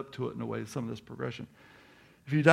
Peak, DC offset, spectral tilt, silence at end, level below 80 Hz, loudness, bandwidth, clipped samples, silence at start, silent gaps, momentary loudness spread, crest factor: -6 dBFS; under 0.1%; -6.5 dB/octave; 0 s; -68 dBFS; -35 LUFS; 13.5 kHz; under 0.1%; 0 s; none; 23 LU; 26 dB